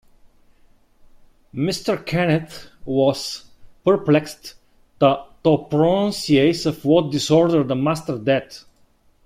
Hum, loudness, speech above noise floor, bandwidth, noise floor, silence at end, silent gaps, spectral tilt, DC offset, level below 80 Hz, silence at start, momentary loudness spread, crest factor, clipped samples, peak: none; -19 LUFS; 38 dB; 15.5 kHz; -57 dBFS; 0.65 s; none; -6 dB/octave; under 0.1%; -52 dBFS; 1.55 s; 18 LU; 18 dB; under 0.1%; -2 dBFS